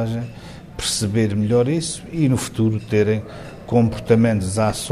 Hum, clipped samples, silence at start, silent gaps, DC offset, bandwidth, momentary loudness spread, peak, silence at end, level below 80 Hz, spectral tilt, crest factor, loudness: none; under 0.1%; 0 s; none; under 0.1%; 13.5 kHz; 14 LU; -2 dBFS; 0 s; -44 dBFS; -5.5 dB/octave; 18 dB; -20 LUFS